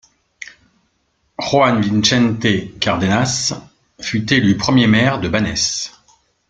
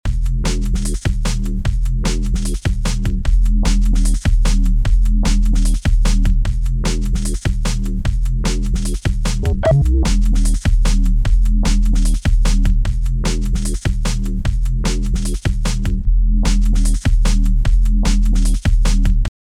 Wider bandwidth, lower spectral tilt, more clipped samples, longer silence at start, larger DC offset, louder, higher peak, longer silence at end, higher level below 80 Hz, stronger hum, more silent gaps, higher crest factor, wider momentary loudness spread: second, 9.4 kHz vs 11.5 kHz; about the same, -4.5 dB/octave vs -5.5 dB/octave; neither; first, 0.4 s vs 0.05 s; neither; first, -16 LUFS vs -19 LUFS; about the same, 0 dBFS vs -2 dBFS; first, 0.6 s vs 0.3 s; second, -46 dBFS vs -14 dBFS; neither; neither; about the same, 16 dB vs 12 dB; first, 18 LU vs 4 LU